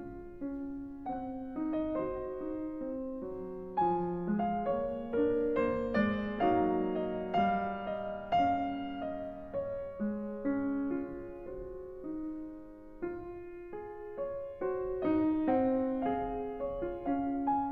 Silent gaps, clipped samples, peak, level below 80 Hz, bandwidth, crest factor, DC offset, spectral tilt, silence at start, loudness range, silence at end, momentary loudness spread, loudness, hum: none; under 0.1%; -18 dBFS; -56 dBFS; 6 kHz; 16 dB; under 0.1%; -9 dB/octave; 0 s; 8 LU; 0 s; 14 LU; -35 LUFS; none